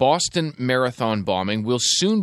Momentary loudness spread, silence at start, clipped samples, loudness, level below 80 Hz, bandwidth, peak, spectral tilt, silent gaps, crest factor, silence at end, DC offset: 5 LU; 0 s; under 0.1%; -21 LUFS; -58 dBFS; 13 kHz; -4 dBFS; -3.5 dB/octave; none; 16 dB; 0 s; under 0.1%